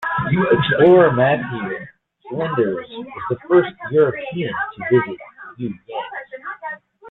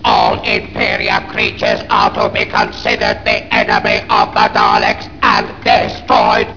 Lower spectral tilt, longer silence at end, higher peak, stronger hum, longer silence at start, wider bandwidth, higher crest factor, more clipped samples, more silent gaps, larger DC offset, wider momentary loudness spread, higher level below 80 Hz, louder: first, -9.5 dB/octave vs -4.5 dB/octave; about the same, 0 s vs 0 s; about the same, -2 dBFS vs 0 dBFS; neither; about the same, 0 s vs 0 s; second, 4.1 kHz vs 5.4 kHz; about the same, 16 dB vs 14 dB; neither; neither; second, under 0.1% vs 1%; first, 18 LU vs 4 LU; second, -54 dBFS vs -36 dBFS; second, -18 LUFS vs -13 LUFS